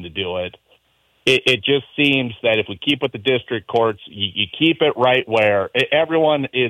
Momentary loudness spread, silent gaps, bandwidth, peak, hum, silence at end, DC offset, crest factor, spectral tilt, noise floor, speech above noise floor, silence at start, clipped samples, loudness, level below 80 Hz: 7 LU; none; 15.5 kHz; -4 dBFS; none; 0 s; under 0.1%; 16 dB; -5 dB/octave; -62 dBFS; 43 dB; 0 s; under 0.1%; -18 LUFS; -58 dBFS